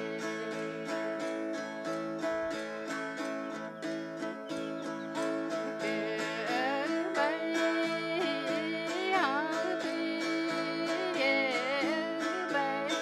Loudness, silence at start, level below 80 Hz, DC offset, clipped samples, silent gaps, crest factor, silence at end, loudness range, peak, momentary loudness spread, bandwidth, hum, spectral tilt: -33 LUFS; 0 s; -78 dBFS; under 0.1%; under 0.1%; none; 18 dB; 0 s; 6 LU; -16 dBFS; 8 LU; 13.5 kHz; none; -4 dB/octave